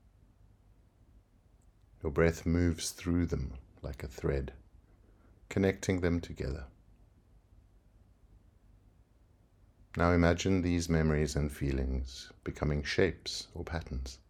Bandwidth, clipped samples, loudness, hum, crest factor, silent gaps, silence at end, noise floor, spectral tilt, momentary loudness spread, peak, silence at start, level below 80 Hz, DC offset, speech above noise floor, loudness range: 14.5 kHz; under 0.1%; -33 LUFS; none; 24 dB; none; 0.15 s; -65 dBFS; -6 dB/octave; 14 LU; -10 dBFS; 2.05 s; -46 dBFS; under 0.1%; 33 dB; 7 LU